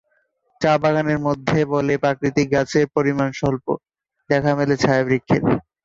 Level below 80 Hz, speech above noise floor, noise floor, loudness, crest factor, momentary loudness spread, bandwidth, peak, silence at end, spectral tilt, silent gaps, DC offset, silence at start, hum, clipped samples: -50 dBFS; 47 dB; -66 dBFS; -20 LUFS; 16 dB; 5 LU; 7.8 kHz; -4 dBFS; 0.25 s; -6.5 dB/octave; none; under 0.1%; 0.6 s; none; under 0.1%